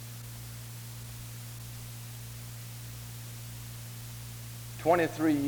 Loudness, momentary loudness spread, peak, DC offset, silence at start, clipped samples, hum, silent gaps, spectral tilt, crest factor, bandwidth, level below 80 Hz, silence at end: -36 LUFS; 15 LU; -14 dBFS; under 0.1%; 0 s; under 0.1%; 60 Hz at -60 dBFS; none; -5.5 dB/octave; 22 dB; over 20 kHz; -56 dBFS; 0 s